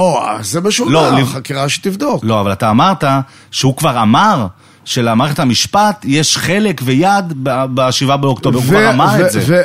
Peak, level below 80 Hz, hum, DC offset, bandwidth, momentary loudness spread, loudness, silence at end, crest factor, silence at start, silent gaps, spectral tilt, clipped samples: 0 dBFS; -46 dBFS; none; 0.3%; 16 kHz; 7 LU; -12 LUFS; 0 s; 12 dB; 0 s; none; -4.5 dB/octave; under 0.1%